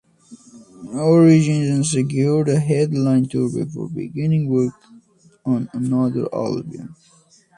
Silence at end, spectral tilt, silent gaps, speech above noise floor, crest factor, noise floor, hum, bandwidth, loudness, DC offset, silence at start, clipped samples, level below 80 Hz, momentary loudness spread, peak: 0.65 s; -7 dB/octave; none; 33 dB; 18 dB; -51 dBFS; none; 11 kHz; -19 LUFS; under 0.1%; 0.3 s; under 0.1%; -58 dBFS; 15 LU; -2 dBFS